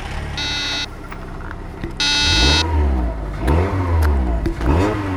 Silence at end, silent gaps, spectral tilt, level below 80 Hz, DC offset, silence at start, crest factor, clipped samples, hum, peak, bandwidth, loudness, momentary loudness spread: 0 s; none; -4.5 dB/octave; -22 dBFS; under 0.1%; 0 s; 18 dB; under 0.1%; none; 0 dBFS; 13 kHz; -18 LUFS; 18 LU